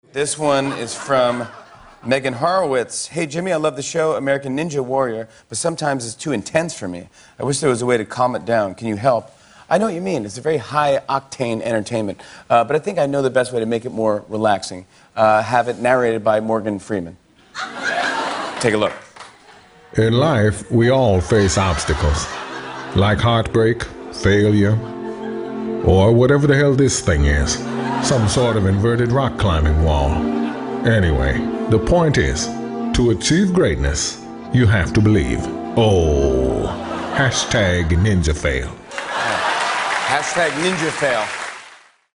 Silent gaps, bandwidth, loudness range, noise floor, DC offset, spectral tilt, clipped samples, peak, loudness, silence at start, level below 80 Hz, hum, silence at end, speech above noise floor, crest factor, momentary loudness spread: none; 11 kHz; 5 LU; -46 dBFS; under 0.1%; -5.5 dB/octave; under 0.1%; 0 dBFS; -18 LUFS; 0.15 s; -30 dBFS; none; 0.4 s; 29 dB; 18 dB; 10 LU